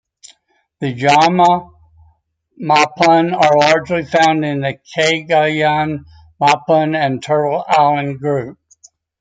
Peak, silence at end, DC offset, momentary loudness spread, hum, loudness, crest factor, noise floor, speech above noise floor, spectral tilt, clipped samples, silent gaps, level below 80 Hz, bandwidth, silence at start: 0 dBFS; 0.65 s; under 0.1%; 10 LU; none; -14 LUFS; 14 dB; -58 dBFS; 44 dB; -5 dB/octave; under 0.1%; none; -56 dBFS; 9.4 kHz; 0.8 s